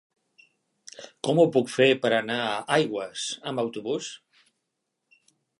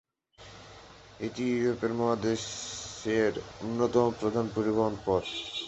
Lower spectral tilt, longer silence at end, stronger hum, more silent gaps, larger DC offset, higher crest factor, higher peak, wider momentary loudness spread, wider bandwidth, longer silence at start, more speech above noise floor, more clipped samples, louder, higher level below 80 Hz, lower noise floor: about the same, -4.5 dB/octave vs -5 dB/octave; first, 1.45 s vs 0 s; neither; neither; neither; about the same, 20 dB vs 20 dB; first, -6 dBFS vs -10 dBFS; about the same, 20 LU vs 21 LU; first, 11.5 kHz vs 8.2 kHz; first, 1 s vs 0.4 s; first, 56 dB vs 25 dB; neither; first, -25 LUFS vs -30 LUFS; second, -78 dBFS vs -58 dBFS; first, -81 dBFS vs -54 dBFS